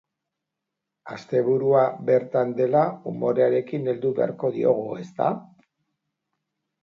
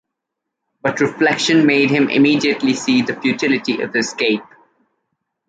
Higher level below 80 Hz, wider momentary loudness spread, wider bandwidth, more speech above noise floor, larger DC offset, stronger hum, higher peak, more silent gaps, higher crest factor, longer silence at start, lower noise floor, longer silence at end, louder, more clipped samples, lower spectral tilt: second, -72 dBFS vs -62 dBFS; about the same, 7 LU vs 6 LU; second, 7 kHz vs 9.2 kHz; about the same, 61 dB vs 64 dB; neither; neither; second, -6 dBFS vs -2 dBFS; neither; about the same, 18 dB vs 16 dB; first, 1.05 s vs 0.85 s; first, -84 dBFS vs -80 dBFS; first, 1.4 s vs 1.05 s; second, -23 LUFS vs -16 LUFS; neither; first, -9 dB/octave vs -4.5 dB/octave